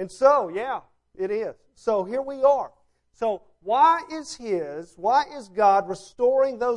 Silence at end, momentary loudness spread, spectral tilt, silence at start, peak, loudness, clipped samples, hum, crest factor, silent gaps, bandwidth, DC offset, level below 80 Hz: 0 s; 14 LU; -4.5 dB/octave; 0 s; -6 dBFS; -23 LUFS; under 0.1%; none; 18 dB; none; 11 kHz; under 0.1%; -64 dBFS